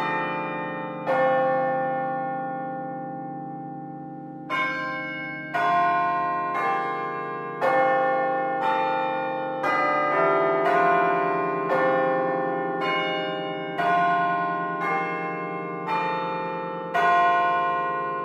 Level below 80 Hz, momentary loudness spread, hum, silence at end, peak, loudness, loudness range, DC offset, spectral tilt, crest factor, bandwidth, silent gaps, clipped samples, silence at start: -74 dBFS; 11 LU; none; 0 s; -10 dBFS; -24 LUFS; 6 LU; under 0.1%; -6.5 dB/octave; 16 dB; 9.2 kHz; none; under 0.1%; 0 s